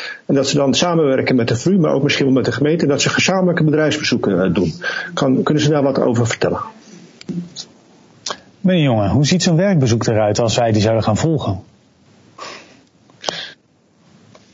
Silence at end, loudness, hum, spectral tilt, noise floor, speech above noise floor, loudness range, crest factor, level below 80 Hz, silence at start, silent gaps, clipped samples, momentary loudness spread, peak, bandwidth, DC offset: 1 s; -16 LUFS; none; -5.5 dB/octave; -55 dBFS; 40 dB; 5 LU; 16 dB; -50 dBFS; 0 s; none; under 0.1%; 14 LU; 0 dBFS; 8 kHz; under 0.1%